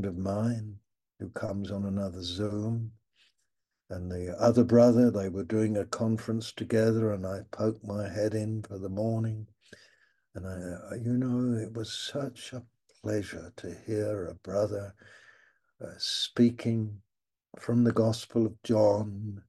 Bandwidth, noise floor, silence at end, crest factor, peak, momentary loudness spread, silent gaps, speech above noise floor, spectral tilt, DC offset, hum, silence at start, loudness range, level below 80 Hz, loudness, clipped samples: 12.5 kHz; -81 dBFS; 0.1 s; 20 dB; -10 dBFS; 17 LU; none; 52 dB; -6.5 dB/octave; under 0.1%; none; 0 s; 9 LU; -64 dBFS; -30 LUFS; under 0.1%